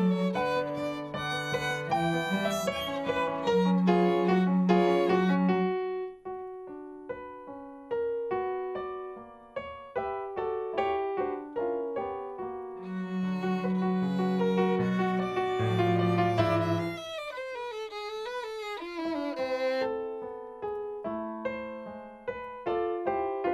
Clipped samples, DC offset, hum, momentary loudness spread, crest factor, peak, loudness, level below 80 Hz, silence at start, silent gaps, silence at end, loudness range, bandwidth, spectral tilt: under 0.1%; under 0.1%; none; 15 LU; 18 dB; -12 dBFS; -30 LUFS; -62 dBFS; 0 s; none; 0 s; 9 LU; 13.5 kHz; -7 dB/octave